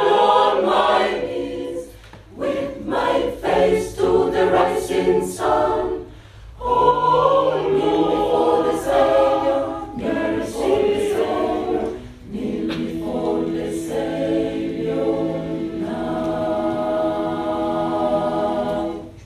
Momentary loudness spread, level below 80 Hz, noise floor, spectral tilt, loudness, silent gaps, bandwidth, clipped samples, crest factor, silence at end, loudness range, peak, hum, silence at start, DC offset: 10 LU; -44 dBFS; -41 dBFS; -5.5 dB/octave; -20 LUFS; none; 14 kHz; under 0.1%; 18 dB; 0 s; 5 LU; -2 dBFS; none; 0 s; under 0.1%